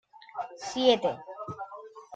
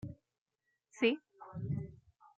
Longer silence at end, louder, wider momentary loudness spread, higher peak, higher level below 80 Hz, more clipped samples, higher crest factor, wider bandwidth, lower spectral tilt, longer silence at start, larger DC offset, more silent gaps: second, 0 s vs 0.4 s; first, -29 LUFS vs -37 LUFS; about the same, 19 LU vs 17 LU; first, -10 dBFS vs -18 dBFS; about the same, -70 dBFS vs -68 dBFS; neither; about the same, 20 dB vs 22 dB; first, 9 kHz vs 8 kHz; second, -4 dB/octave vs -6.5 dB/octave; about the same, 0.15 s vs 0.05 s; neither; second, none vs 0.38-0.46 s